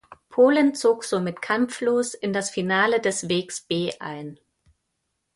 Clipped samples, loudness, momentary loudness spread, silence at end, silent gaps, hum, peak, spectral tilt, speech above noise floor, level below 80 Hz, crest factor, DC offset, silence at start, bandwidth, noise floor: under 0.1%; -23 LUFS; 12 LU; 1 s; none; none; -6 dBFS; -4 dB/octave; 54 dB; -66 dBFS; 18 dB; under 0.1%; 0.1 s; 11.5 kHz; -77 dBFS